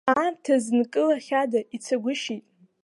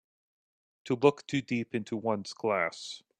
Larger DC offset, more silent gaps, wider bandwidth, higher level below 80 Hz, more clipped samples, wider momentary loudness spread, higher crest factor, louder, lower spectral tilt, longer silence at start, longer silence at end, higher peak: neither; neither; first, 11.5 kHz vs 9.4 kHz; about the same, -74 dBFS vs -74 dBFS; neither; about the same, 7 LU vs 8 LU; second, 18 dB vs 24 dB; first, -25 LUFS vs -31 LUFS; second, -4 dB/octave vs -5.5 dB/octave; second, 0.05 s vs 0.85 s; first, 0.45 s vs 0.2 s; about the same, -6 dBFS vs -8 dBFS